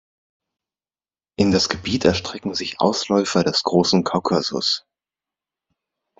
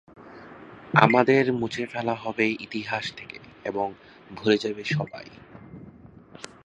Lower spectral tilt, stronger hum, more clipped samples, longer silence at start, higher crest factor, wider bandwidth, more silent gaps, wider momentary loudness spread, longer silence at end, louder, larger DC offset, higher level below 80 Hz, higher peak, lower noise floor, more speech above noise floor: second, -4.5 dB/octave vs -6 dB/octave; neither; neither; first, 1.4 s vs 0.15 s; second, 20 dB vs 26 dB; second, 7.8 kHz vs 10 kHz; neither; second, 8 LU vs 26 LU; first, 1.4 s vs 0.2 s; first, -20 LUFS vs -25 LUFS; neither; first, -54 dBFS vs -62 dBFS; about the same, -2 dBFS vs 0 dBFS; first, under -90 dBFS vs -48 dBFS; first, over 70 dB vs 24 dB